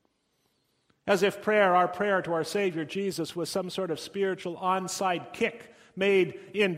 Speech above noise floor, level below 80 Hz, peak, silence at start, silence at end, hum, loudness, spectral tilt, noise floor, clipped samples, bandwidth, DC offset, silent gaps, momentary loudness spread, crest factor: 46 dB; -70 dBFS; -10 dBFS; 1.05 s; 0 s; none; -28 LUFS; -4.5 dB/octave; -74 dBFS; under 0.1%; 16 kHz; under 0.1%; none; 8 LU; 20 dB